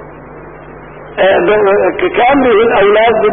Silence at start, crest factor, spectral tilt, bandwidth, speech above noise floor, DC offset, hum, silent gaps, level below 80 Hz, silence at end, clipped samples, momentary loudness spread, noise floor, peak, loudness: 0 s; 10 dB; -11 dB/octave; 3.7 kHz; 22 dB; under 0.1%; none; none; -38 dBFS; 0 s; under 0.1%; 4 LU; -31 dBFS; 0 dBFS; -9 LUFS